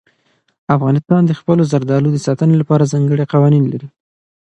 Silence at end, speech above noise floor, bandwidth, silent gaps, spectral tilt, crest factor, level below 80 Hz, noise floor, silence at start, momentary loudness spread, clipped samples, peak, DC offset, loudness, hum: 0.6 s; 47 dB; 8.8 kHz; none; -8.5 dB/octave; 14 dB; -56 dBFS; -60 dBFS; 0.7 s; 5 LU; under 0.1%; 0 dBFS; under 0.1%; -14 LUFS; none